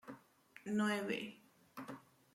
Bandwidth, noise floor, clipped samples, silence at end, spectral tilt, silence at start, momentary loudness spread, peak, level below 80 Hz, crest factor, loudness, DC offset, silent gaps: 15.5 kHz; -64 dBFS; under 0.1%; 0.35 s; -5 dB/octave; 0.05 s; 21 LU; -24 dBFS; -86 dBFS; 18 dB; -40 LUFS; under 0.1%; none